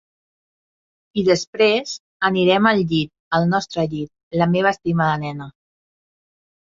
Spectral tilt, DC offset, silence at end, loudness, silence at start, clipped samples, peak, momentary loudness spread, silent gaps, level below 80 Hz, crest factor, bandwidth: -5.5 dB/octave; under 0.1%; 1.15 s; -19 LUFS; 1.15 s; under 0.1%; -2 dBFS; 13 LU; 1.47-1.53 s, 2.00-2.20 s, 3.20-3.31 s, 4.23-4.31 s; -56 dBFS; 18 dB; 7.6 kHz